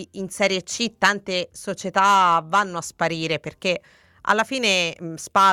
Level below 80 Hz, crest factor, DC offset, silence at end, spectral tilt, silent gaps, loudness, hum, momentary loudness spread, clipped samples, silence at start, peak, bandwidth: -62 dBFS; 20 dB; under 0.1%; 0 s; -3 dB/octave; none; -21 LUFS; none; 12 LU; under 0.1%; 0 s; -2 dBFS; 16.5 kHz